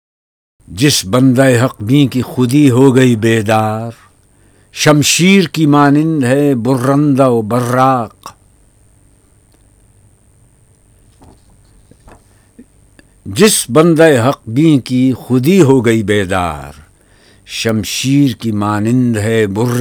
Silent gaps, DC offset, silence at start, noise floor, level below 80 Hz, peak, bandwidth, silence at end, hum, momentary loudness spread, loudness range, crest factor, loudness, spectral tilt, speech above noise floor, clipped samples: none; under 0.1%; 0.7 s; -49 dBFS; -46 dBFS; 0 dBFS; 19.5 kHz; 0 s; none; 9 LU; 5 LU; 12 dB; -11 LUFS; -5.5 dB/octave; 38 dB; 0.4%